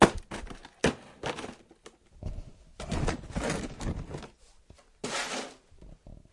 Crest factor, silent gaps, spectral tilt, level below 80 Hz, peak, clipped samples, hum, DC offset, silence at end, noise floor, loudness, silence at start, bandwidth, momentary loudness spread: 32 dB; none; -4.5 dB/octave; -44 dBFS; -2 dBFS; under 0.1%; none; under 0.1%; 0.15 s; -57 dBFS; -35 LUFS; 0 s; 12 kHz; 23 LU